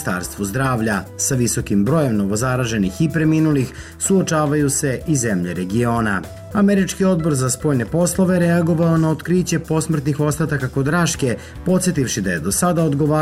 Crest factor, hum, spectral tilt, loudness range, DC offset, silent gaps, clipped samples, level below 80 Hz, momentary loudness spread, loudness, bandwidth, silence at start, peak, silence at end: 10 dB; none; -5.5 dB/octave; 2 LU; 0.1%; none; under 0.1%; -40 dBFS; 5 LU; -18 LUFS; 16 kHz; 0 s; -8 dBFS; 0 s